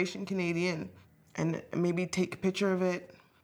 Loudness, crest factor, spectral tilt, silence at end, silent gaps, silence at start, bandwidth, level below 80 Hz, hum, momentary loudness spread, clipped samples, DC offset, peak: -32 LUFS; 18 dB; -6 dB/octave; 0.3 s; none; 0 s; 13.5 kHz; -72 dBFS; none; 10 LU; under 0.1%; under 0.1%; -16 dBFS